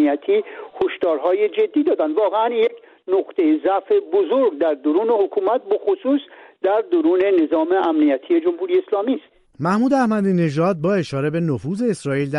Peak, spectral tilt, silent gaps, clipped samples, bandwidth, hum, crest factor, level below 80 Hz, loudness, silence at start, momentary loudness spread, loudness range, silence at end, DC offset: -6 dBFS; -7.5 dB/octave; none; under 0.1%; 11 kHz; none; 12 dB; -62 dBFS; -19 LUFS; 0 s; 5 LU; 1 LU; 0 s; under 0.1%